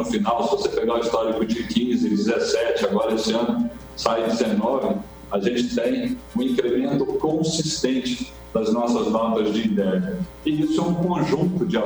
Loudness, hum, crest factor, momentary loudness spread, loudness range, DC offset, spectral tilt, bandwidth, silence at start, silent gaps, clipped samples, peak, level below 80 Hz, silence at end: -22 LUFS; none; 16 dB; 5 LU; 1 LU; under 0.1%; -5.5 dB/octave; over 20 kHz; 0 s; none; under 0.1%; -6 dBFS; -48 dBFS; 0 s